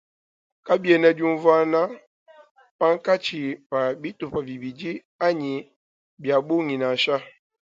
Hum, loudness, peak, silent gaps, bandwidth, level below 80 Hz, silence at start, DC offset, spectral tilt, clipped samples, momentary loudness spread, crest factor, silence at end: none; -23 LUFS; -4 dBFS; 2.07-2.26 s, 2.51-2.55 s, 2.71-2.79 s, 3.66-3.70 s, 5.05-5.19 s, 5.76-6.17 s; 7.6 kHz; -66 dBFS; 0.65 s; under 0.1%; -6 dB/octave; under 0.1%; 14 LU; 20 dB; 0.45 s